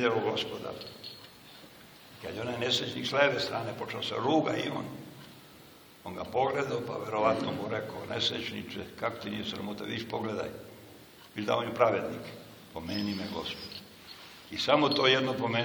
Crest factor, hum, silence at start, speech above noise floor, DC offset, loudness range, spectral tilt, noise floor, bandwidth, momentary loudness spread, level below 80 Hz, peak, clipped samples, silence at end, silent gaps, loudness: 24 dB; none; 0 s; 23 dB; under 0.1%; 4 LU; -4.5 dB/octave; -54 dBFS; over 20 kHz; 22 LU; -66 dBFS; -8 dBFS; under 0.1%; 0 s; none; -31 LUFS